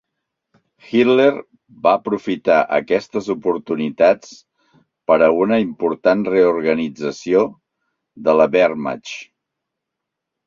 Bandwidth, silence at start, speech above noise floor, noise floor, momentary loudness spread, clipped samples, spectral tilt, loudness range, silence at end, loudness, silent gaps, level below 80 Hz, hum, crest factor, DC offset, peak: 7.6 kHz; 0.9 s; 64 dB; -81 dBFS; 11 LU; under 0.1%; -6 dB/octave; 2 LU; 1.25 s; -17 LUFS; none; -60 dBFS; none; 18 dB; under 0.1%; 0 dBFS